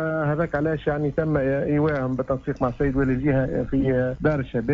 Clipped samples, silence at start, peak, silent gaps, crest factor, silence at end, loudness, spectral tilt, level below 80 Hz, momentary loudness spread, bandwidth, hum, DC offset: under 0.1%; 0 s; -10 dBFS; none; 14 dB; 0 s; -23 LUFS; -10 dB/octave; -38 dBFS; 4 LU; 7 kHz; none; under 0.1%